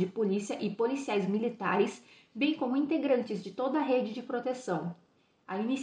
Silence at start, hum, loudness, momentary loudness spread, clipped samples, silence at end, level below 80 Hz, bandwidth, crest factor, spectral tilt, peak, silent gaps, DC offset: 0 s; none; -32 LUFS; 8 LU; under 0.1%; 0 s; -82 dBFS; 10 kHz; 16 dB; -6 dB/octave; -16 dBFS; none; under 0.1%